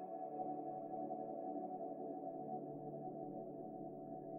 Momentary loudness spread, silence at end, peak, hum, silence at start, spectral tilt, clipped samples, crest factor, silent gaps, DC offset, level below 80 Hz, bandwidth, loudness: 5 LU; 0 s; -32 dBFS; none; 0 s; -7.5 dB/octave; under 0.1%; 14 dB; none; under 0.1%; -88 dBFS; 2.7 kHz; -48 LUFS